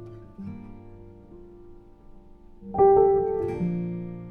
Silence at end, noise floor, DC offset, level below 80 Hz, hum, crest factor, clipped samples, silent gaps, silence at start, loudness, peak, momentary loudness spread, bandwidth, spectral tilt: 0 s; -48 dBFS; under 0.1%; -50 dBFS; none; 18 dB; under 0.1%; none; 0 s; -23 LUFS; -8 dBFS; 24 LU; 2.7 kHz; -11 dB/octave